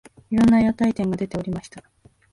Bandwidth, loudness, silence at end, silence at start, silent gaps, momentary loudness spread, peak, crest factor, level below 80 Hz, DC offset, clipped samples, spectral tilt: 11 kHz; -21 LUFS; 0.55 s; 0.3 s; none; 13 LU; -8 dBFS; 12 dB; -46 dBFS; under 0.1%; under 0.1%; -7.5 dB/octave